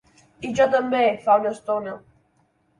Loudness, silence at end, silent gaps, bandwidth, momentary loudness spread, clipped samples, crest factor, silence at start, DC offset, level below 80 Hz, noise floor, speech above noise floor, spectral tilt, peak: -21 LUFS; 0.8 s; none; 11 kHz; 16 LU; under 0.1%; 16 dB; 0.4 s; under 0.1%; -62 dBFS; -65 dBFS; 44 dB; -5 dB/octave; -6 dBFS